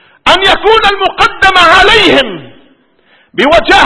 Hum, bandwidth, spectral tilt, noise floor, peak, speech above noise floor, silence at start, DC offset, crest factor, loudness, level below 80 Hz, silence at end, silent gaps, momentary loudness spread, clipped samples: none; 11 kHz; -3 dB/octave; -48 dBFS; 0 dBFS; 42 dB; 0.25 s; under 0.1%; 8 dB; -6 LUFS; -30 dBFS; 0 s; none; 10 LU; 5%